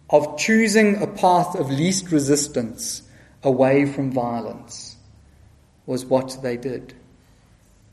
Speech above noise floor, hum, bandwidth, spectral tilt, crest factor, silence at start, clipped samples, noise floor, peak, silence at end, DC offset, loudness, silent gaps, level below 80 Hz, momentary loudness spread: 34 dB; none; 13.5 kHz; -4.5 dB/octave; 20 dB; 0.1 s; under 0.1%; -54 dBFS; -2 dBFS; 1 s; under 0.1%; -20 LUFS; none; -56 dBFS; 16 LU